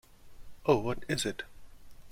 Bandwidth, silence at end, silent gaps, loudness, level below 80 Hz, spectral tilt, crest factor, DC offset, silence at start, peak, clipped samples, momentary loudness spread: 16.5 kHz; 0 s; none; -32 LUFS; -54 dBFS; -4.5 dB/octave; 24 dB; under 0.1%; 0.1 s; -10 dBFS; under 0.1%; 14 LU